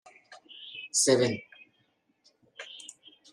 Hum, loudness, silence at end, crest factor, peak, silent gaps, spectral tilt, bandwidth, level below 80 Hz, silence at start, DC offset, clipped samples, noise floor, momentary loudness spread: none; -26 LUFS; 0.45 s; 24 dB; -10 dBFS; none; -3 dB/octave; 13.5 kHz; -78 dBFS; 0.3 s; under 0.1%; under 0.1%; -72 dBFS; 23 LU